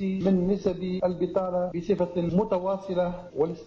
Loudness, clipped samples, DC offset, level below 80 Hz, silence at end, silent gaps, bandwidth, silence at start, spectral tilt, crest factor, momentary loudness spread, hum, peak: -27 LUFS; under 0.1%; under 0.1%; -52 dBFS; 0 s; none; 7 kHz; 0 s; -9 dB/octave; 14 dB; 5 LU; none; -14 dBFS